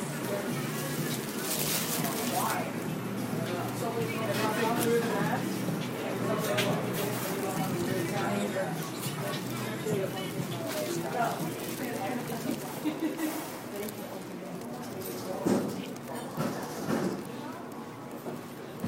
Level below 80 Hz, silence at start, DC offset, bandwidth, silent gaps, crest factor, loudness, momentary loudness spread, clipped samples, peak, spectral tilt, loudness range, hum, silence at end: -68 dBFS; 0 s; under 0.1%; 16 kHz; none; 18 dB; -32 LUFS; 11 LU; under 0.1%; -14 dBFS; -4.5 dB/octave; 5 LU; none; 0 s